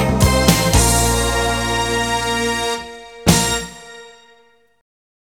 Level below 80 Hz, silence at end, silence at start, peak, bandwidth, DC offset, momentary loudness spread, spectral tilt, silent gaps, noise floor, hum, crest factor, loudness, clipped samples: -26 dBFS; 1.15 s; 0 s; 0 dBFS; over 20 kHz; 0.1%; 14 LU; -3.5 dB/octave; none; -54 dBFS; none; 18 dB; -16 LUFS; under 0.1%